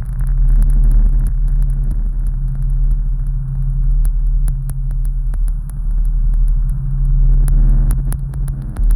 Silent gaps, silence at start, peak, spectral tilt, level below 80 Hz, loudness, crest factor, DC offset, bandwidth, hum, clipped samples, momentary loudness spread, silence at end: none; 0 s; -4 dBFS; -8.5 dB/octave; -14 dBFS; -19 LUFS; 8 dB; under 0.1%; 11.5 kHz; none; under 0.1%; 7 LU; 0 s